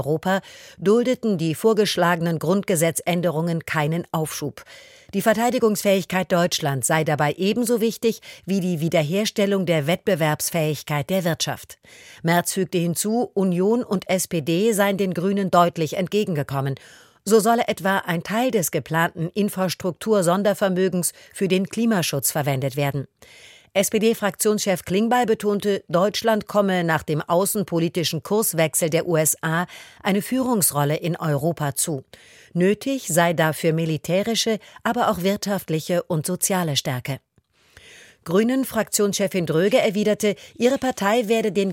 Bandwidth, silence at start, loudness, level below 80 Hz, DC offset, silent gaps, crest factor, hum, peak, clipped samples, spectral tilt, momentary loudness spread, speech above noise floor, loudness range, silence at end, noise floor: 17 kHz; 0 s; -21 LUFS; -60 dBFS; under 0.1%; none; 18 dB; none; -2 dBFS; under 0.1%; -4.5 dB/octave; 6 LU; 39 dB; 2 LU; 0 s; -61 dBFS